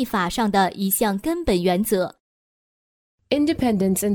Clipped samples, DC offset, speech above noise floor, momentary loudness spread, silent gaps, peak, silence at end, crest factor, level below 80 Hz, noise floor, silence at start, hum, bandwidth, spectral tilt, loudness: under 0.1%; under 0.1%; over 69 dB; 4 LU; 2.20-3.18 s; -4 dBFS; 0 s; 18 dB; -44 dBFS; under -90 dBFS; 0 s; none; over 20 kHz; -5 dB/octave; -21 LUFS